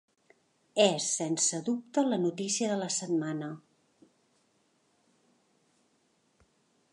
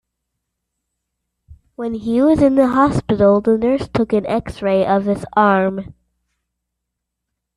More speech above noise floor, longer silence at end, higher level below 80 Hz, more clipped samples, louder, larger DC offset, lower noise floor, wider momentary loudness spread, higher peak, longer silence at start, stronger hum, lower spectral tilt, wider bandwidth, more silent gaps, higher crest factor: second, 42 dB vs 63 dB; first, 3.35 s vs 1.7 s; second, -84 dBFS vs -44 dBFS; neither; second, -30 LUFS vs -16 LUFS; neither; second, -72 dBFS vs -79 dBFS; about the same, 10 LU vs 9 LU; second, -10 dBFS vs -2 dBFS; second, 0.75 s vs 1.5 s; neither; second, -3.5 dB/octave vs -8 dB/octave; about the same, 11.5 kHz vs 11.5 kHz; neither; first, 24 dB vs 16 dB